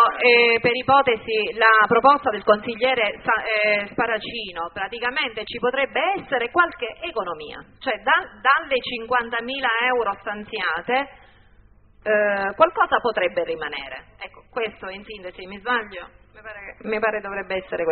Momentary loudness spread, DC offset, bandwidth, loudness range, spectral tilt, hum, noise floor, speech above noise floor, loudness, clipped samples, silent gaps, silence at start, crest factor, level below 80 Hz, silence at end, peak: 18 LU; under 0.1%; 4.5 kHz; 10 LU; -0.5 dB/octave; none; -53 dBFS; 31 dB; -21 LUFS; under 0.1%; none; 0 s; 20 dB; -54 dBFS; 0 s; -2 dBFS